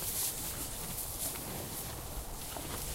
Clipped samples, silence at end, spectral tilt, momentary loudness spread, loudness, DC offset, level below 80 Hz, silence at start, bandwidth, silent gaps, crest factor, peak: under 0.1%; 0 s; -2.5 dB/octave; 8 LU; -38 LUFS; under 0.1%; -48 dBFS; 0 s; 16 kHz; none; 18 dB; -20 dBFS